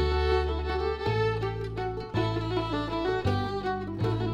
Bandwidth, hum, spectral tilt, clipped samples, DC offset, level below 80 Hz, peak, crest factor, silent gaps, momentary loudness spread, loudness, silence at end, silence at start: 9.4 kHz; none; -7.5 dB/octave; under 0.1%; under 0.1%; -36 dBFS; -14 dBFS; 14 dB; none; 5 LU; -29 LUFS; 0 s; 0 s